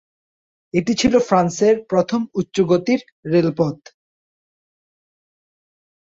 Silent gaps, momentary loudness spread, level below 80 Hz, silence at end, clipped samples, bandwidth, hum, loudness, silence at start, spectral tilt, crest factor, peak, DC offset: 3.12-3.23 s; 7 LU; -54 dBFS; 2.4 s; under 0.1%; 7.8 kHz; none; -18 LUFS; 0.75 s; -6 dB/octave; 18 dB; -2 dBFS; under 0.1%